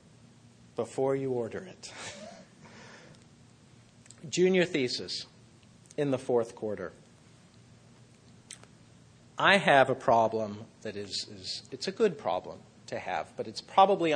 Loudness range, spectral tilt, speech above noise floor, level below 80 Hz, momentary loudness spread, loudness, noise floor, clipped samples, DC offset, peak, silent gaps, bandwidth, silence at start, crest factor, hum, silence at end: 9 LU; -4.5 dB/octave; 29 dB; -70 dBFS; 25 LU; -29 LUFS; -58 dBFS; under 0.1%; under 0.1%; -6 dBFS; none; 10 kHz; 0.8 s; 24 dB; none; 0 s